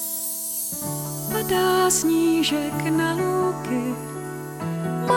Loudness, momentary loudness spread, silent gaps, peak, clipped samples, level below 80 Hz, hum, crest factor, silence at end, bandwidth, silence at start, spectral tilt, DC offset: -23 LUFS; 11 LU; none; -8 dBFS; under 0.1%; -54 dBFS; none; 16 dB; 0 s; 17.5 kHz; 0 s; -4 dB/octave; under 0.1%